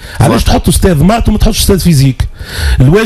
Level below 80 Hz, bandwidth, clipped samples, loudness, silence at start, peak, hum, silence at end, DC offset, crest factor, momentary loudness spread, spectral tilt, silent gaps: -14 dBFS; 15 kHz; 1%; -9 LUFS; 0 s; 0 dBFS; none; 0 s; under 0.1%; 8 dB; 7 LU; -5.5 dB/octave; none